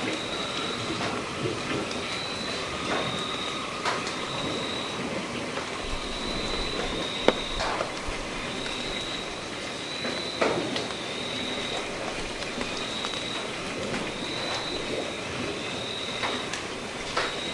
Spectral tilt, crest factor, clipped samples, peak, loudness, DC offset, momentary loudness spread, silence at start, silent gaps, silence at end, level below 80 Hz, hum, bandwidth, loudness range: -3 dB/octave; 30 dB; under 0.1%; 0 dBFS; -30 LUFS; under 0.1%; 4 LU; 0 s; none; 0 s; -46 dBFS; none; 11.5 kHz; 1 LU